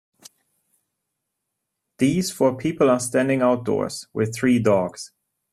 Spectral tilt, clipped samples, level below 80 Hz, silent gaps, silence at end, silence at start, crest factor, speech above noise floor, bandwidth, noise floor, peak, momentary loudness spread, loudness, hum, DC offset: -5.5 dB/octave; under 0.1%; -60 dBFS; none; 0.45 s; 2 s; 18 dB; 60 dB; 13.5 kHz; -80 dBFS; -4 dBFS; 9 LU; -21 LUFS; none; under 0.1%